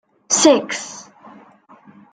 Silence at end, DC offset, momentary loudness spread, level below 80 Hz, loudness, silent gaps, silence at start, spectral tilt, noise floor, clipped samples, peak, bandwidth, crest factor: 1.1 s; under 0.1%; 21 LU; -68 dBFS; -16 LUFS; none; 0.3 s; -1.5 dB/octave; -48 dBFS; under 0.1%; -2 dBFS; 10 kHz; 18 dB